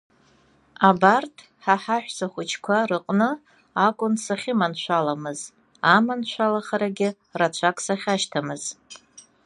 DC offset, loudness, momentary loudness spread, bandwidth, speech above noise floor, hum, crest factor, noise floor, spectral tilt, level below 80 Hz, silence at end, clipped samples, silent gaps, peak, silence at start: under 0.1%; -23 LUFS; 14 LU; 11.5 kHz; 36 dB; none; 22 dB; -59 dBFS; -4.5 dB/octave; -72 dBFS; 0.5 s; under 0.1%; none; -2 dBFS; 0.8 s